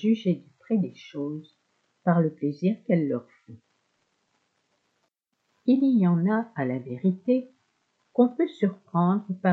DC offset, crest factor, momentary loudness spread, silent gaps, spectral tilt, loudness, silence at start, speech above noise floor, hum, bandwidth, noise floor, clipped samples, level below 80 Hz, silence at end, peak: under 0.1%; 18 dB; 11 LU; none; -10 dB/octave; -26 LUFS; 0 s; 51 dB; none; 6.2 kHz; -76 dBFS; under 0.1%; -82 dBFS; 0 s; -8 dBFS